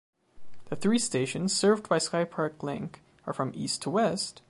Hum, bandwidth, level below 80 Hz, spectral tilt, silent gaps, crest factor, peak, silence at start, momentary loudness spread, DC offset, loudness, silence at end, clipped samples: none; 11.5 kHz; -68 dBFS; -4 dB/octave; none; 18 dB; -12 dBFS; 0.35 s; 13 LU; under 0.1%; -28 LUFS; 0.1 s; under 0.1%